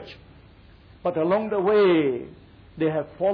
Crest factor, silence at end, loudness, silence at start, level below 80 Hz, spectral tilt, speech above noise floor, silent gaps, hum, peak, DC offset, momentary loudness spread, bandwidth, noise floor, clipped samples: 12 dB; 0 s; -23 LUFS; 0 s; -56 dBFS; -9.5 dB/octave; 28 dB; none; none; -12 dBFS; under 0.1%; 15 LU; 5.4 kHz; -50 dBFS; under 0.1%